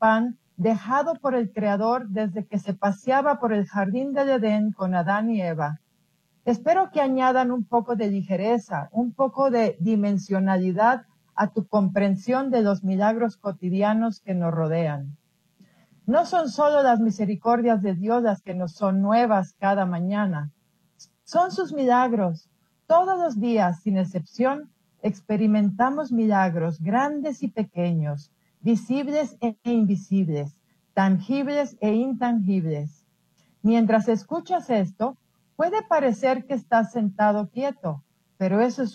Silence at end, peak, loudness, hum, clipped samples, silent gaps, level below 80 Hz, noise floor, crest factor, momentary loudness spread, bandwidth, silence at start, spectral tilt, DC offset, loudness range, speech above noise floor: 0 s; -8 dBFS; -24 LUFS; none; under 0.1%; none; -70 dBFS; -67 dBFS; 16 dB; 8 LU; 8.4 kHz; 0 s; -7.5 dB/octave; under 0.1%; 2 LU; 45 dB